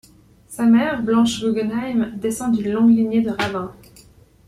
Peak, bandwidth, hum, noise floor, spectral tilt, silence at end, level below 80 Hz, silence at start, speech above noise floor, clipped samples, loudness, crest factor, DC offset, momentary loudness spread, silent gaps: -6 dBFS; 13 kHz; none; -49 dBFS; -5.5 dB/octave; 0.75 s; -52 dBFS; 0.5 s; 31 dB; under 0.1%; -19 LUFS; 14 dB; under 0.1%; 8 LU; none